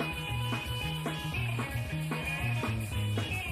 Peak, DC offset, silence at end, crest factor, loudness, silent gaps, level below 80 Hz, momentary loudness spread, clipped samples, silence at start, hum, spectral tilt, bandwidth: -22 dBFS; under 0.1%; 0 s; 12 dB; -33 LUFS; none; -46 dBFS; 2 LU; under 0.1%; 0 s; none; -5 dB/octave; 15 kHz